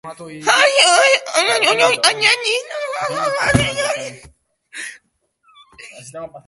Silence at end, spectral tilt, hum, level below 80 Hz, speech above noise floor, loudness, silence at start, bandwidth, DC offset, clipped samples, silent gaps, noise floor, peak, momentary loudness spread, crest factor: 0.05 s; -2 dB/octave; none; -44 dBFS; 47 dB; -14 LUFS; 0.05 s; 12 kHz; under 0.1%; under 0.1%; none; -63 dBFS; 0 dBFS; 22 LU; 18 dB